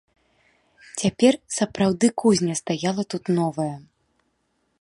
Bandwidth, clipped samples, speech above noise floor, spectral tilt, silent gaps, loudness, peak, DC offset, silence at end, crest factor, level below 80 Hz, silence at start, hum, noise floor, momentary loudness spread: 11.5 kHz; under 0.1%; 49 dB; -5 dB/octave; none; -22 LUFS; -4 dBFS; under 0.1%; 1 s; 20 dB; -58 dBFS; 0.95 s; none; -71 dBFS; 10 LU